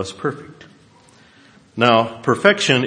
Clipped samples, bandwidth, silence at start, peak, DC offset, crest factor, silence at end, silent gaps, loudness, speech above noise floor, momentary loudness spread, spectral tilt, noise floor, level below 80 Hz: under 0.1%; 11 kHz; 0 s; 0 dBFS; under 0.1%; 20 dB; 0 s; none; -17 LUFS; 32 dB; 17 LU; -4.5 dB/octave; -50 dBFS; -62 dBFS